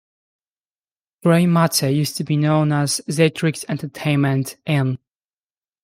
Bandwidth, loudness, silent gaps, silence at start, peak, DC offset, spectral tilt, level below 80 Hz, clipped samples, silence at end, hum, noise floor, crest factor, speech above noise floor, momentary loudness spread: 16 kHz; -19 LUFS; none; 1.25 s; -4 dBFS; under 0.1%; -5.5 dB/octave; -62 dBFS; under 0.1%; 0.9 s; none; under -90 dBFS; 16 dB; over 72 dB; 8 LU